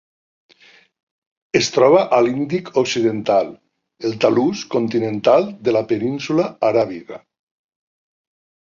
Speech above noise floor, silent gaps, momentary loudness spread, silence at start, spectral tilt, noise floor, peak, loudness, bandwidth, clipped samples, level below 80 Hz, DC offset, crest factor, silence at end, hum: 34 dB; none; 11 LU; 1.55 s; -5 dB/octave; -51 dBFS; 0 dBFS; -18 LUFS; 7.6 kHz; under 0.1%; -60 dBFS; under 0.1%; 18 dB; 1.45 s; none